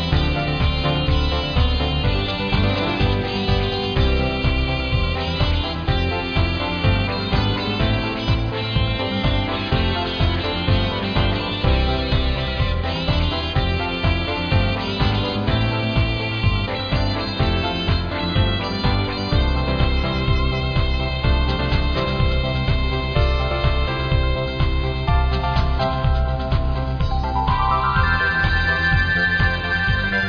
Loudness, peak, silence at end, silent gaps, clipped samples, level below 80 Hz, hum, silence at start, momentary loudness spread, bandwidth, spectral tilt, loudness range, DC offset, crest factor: -20 LUFS; -4 dBFS; 0 s; none; under 0.1%; -24 dBFS; none; 0 s; 4 LU; 5.4 kHz; -7 dB/octave; 1 LU; under 0.1%; 16 dB